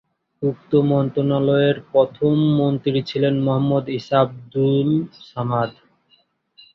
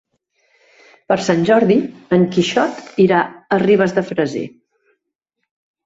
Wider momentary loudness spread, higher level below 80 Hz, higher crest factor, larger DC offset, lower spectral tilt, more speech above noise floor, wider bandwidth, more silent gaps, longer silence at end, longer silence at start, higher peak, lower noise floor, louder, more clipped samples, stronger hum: about the same, 7 LU vs 7 LU; about the same, -58 dBFS vs -58 dBFS; about the same, 16 dB vs 16 dB; neither; first, -9 dB/octave vs -6 dB/octave; second, 42 dB vs 61 dB; second, 6.2 kHz vs 7.8 kHz; neither; second, 1.05 s vs 1.35 s; second, 0.4 s vs 1.1 s; about the same, -4 dBFS vs -2 dBFS; second, -61 dBFS vs -76 dBFS; second, -20 LUFS vs -16 LUFS; neither; neither